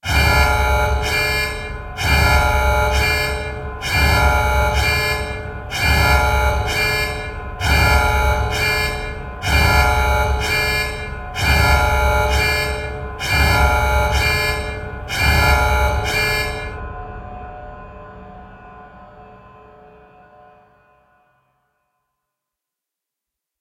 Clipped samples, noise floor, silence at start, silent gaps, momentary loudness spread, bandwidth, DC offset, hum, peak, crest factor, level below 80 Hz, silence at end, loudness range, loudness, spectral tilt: under 0.1%; -85 dBFS; 0.05 s; none; 14 LU; 16 kHz; under 0.1%; none; 0 dBFS; 18 dB; -24 dBFS; 4.1 s; 5 LU; -17 LUFS; -4 dB/octave